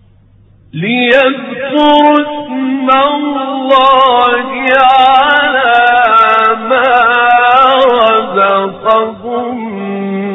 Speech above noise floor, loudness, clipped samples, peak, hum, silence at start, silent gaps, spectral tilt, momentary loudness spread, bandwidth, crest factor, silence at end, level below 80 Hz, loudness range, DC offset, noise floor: 35 dB; -9 LUFS; 0.4%; 0 dBFS; none; 0.75 s; none; -6 dB/octave; 11 LU; 8 kHz; 10 dB; 0 s; -48 dBFS; 3 LU; under 0.1%; -43 dBFS